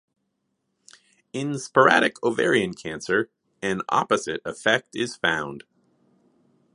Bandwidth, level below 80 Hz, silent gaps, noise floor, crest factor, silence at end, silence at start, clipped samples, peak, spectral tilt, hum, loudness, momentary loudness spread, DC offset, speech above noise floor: 11.5 kHz; -64 dBFS; none; -76 dBFS; 24 dB; 1.15 s; 1.35 s; under 0.1%; -2 dBFS; -4 dB/octave; none; -23 LUFS; 15 LU; under 0.1%; 53 dB